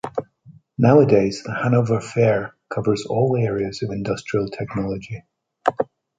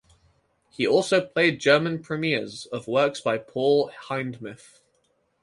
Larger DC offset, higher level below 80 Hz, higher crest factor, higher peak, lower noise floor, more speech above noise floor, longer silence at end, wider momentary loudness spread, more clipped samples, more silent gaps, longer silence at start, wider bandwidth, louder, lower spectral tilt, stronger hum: neither; first, -52 dBFS vs -66 dBFS; about the same, 20 dB vs 20 dB; first, -2 dBFS vs -6 dBFS; second, -49 dBFS vs -69 dBFS; second, 30 dB vs 45 dB; second, 0.35 s vs 0.9 s; about the same, 14 LU vs 13 LU; neither; neither; second, 0.05 s vs 0.8 s; second, 9.2 kHz vs 11.5 kHz; first, -21 LUFS vs -24 LUFS; first, -7.5 dB/octave vs -5 dB/octave; neither